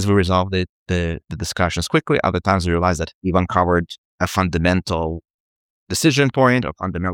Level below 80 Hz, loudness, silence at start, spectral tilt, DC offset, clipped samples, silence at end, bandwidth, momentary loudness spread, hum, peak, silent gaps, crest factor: -38 dBFS; -19 LUFS; 0 s; -5.5 dB/octave; under 0.1%; under 0.1%; 0 s; 18 kHz; 9 LU; none; -2 dBFS; 0.69-0.86 s, 3.14-3.21 s, 3.98-4.18 s, 5.30-5.87 s; 18 dB